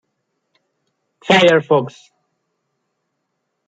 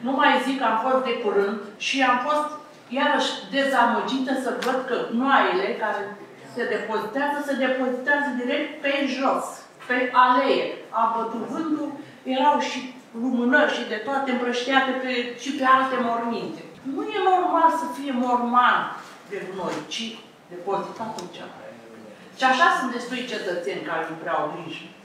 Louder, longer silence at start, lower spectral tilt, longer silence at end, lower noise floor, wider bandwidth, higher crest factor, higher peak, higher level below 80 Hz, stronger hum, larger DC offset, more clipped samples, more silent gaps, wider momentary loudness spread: first, -13 LUFS vs -23 LUFS; first, 1.25 s vs 0 s; first, -5 dB/octave vs -3.5 dB/octave; first, 1.8 s vs 0 s; first, -73 dBFS vs -44 dBFS; second, 9.2 kHz vs 15 kHz; about the same, 18 dB vs 20 dB; about the same, -2 dBFS vs -4 dBFS; first, -64 dBFS vs -78 dBFS; neither; neither; neither; neither; first, 20 LU vs 16 LU